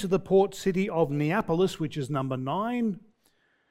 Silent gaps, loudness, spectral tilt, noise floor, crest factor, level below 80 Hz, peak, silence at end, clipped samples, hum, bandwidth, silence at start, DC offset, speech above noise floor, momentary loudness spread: none; -27 LUFS; -7 dB/octave; -68 dBFS; 16 dB; -58 dBFS; -10 dBFS; 0.7 s; under 0.1%; none; 15 kHz; 0 s; under 0.1%; 42 dB; 7 LU